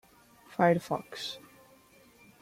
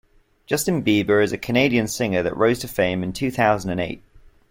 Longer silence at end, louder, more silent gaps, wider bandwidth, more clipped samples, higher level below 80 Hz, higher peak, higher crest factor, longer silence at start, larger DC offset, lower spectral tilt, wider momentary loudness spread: first, 1.05 s vs 0.55 s; second, -31 LUFS vs -21 LUFS; neither; about the same, 16 kHz vs 16.5 kHz; neither; second, -72 dBFS vs -48 dBFS; second, -12 dBFS vs -4 dBFS; about the same, 22 dB vs 18 dB; about the same, 0.5 s vs 0.5 s; neither; about the same, -6 dB/octave vs -5 dB/octave; first, 16 LU vs 8 LU